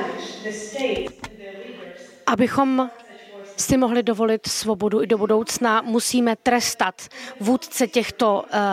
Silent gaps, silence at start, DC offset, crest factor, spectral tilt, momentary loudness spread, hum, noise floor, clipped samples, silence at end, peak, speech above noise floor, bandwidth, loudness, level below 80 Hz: none; 0 s; under 0.1%; 18 dB; -3.5 dB/octave; 18 LU; none; -41 dBFS; under 0.1%; 0 s; -4 dBFS; 20 dB; 16 kHz; -21 LUFS; -52 dBFS